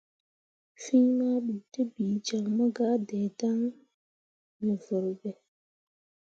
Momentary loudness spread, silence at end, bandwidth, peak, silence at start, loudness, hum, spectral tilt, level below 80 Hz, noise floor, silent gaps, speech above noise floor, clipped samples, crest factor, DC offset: 10 LU; 0.95 s; 7.8 kHz; -14 dBFS; 0.8 s; -29 LUFS; none; -6.5 dB/octave; -78 dBFS; under -90 dBFS; 3.94-4.60 s; over 62 dB; under 0.1%; 18 dB; under 0.1%